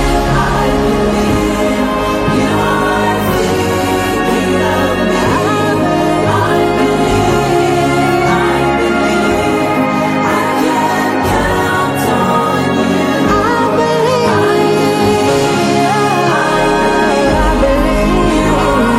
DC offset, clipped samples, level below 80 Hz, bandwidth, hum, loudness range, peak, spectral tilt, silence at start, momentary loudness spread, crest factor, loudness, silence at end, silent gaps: under 0.1%; under 0.1%; -26 dBFS; 16 kHz; none; 1 LU; -2 dBFS; -5.5 dB/octave; 0 s; 2 LU; 10 dB; -12 LUFS; 0 s; none